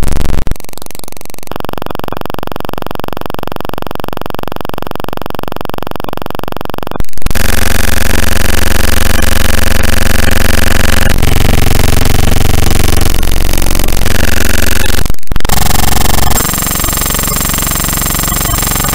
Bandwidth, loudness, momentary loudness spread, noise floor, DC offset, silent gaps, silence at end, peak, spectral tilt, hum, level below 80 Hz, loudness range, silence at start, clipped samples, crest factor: 16.5 kHz; -13 LUFS; 10 LU; -29 dBFS; under 0.1%; none; 0 s; 0 dBFS; -3.5 dB/octave; none; -14 dBFS; 10 LU; 0 s; under 0.1%; 8 dB